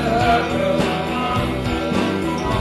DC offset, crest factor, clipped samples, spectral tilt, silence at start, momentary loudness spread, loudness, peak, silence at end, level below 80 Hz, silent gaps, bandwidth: under 0.1%; 14 dB; under 0.1%; -6 dB/octave; 0 s; 5 LU; -20 LUFS; -4 dBFS; 0 s; -34 dBFS; none; 13 kHz